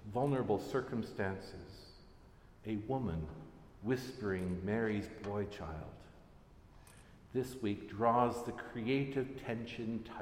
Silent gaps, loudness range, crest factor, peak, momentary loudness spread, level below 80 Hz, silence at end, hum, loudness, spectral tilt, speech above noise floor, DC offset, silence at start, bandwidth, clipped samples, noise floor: none; 5 LU; 22 dB; -18 dBFS; 18 LU; -60 dBFS; 0 s; none; -38 LUFS; -7 dB/octave; 22 dB; under 0.1%; 0 s; 16 kHz; under 0.1%; -60 dBFS